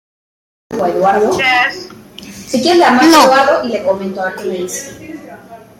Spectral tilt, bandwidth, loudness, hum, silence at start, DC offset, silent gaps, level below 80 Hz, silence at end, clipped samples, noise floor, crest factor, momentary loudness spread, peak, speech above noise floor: -3.5 dB/octave; 16.5 kHz; -12 LUFS; none; 0.7 s; under 0.1%; none; -52 dBFS; 0.25 s; under 0.1%; -35 dBFS; 14 dB; 24 LU; 0 dBFS; 23 dB